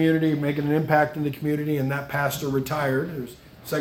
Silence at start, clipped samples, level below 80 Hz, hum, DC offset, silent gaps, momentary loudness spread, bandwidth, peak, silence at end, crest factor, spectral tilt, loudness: 0 s; under 0.1%; -56 dBFS; none; under 0.1%; none; 10 LU; 17 kHz; -6 dBFS; 0 s; 18 dB; -6.5 dB/octave; -24 LUFS